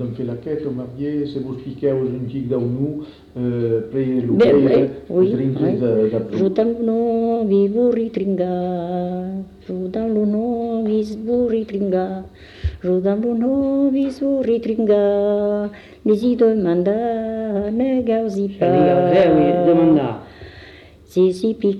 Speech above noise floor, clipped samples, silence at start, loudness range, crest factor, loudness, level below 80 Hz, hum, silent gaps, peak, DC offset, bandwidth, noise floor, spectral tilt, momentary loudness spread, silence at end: 25 dB; under 0.1%; 0 s; 5 LU; 14 dB; -19 LUFS; -44 dBFS; 50 Hz at -55 dBFS; none; -6 dBFS; under 0.1%; 10.5 kHz; -43 dBFS; -9 dB/octave; 12 LU; 0 s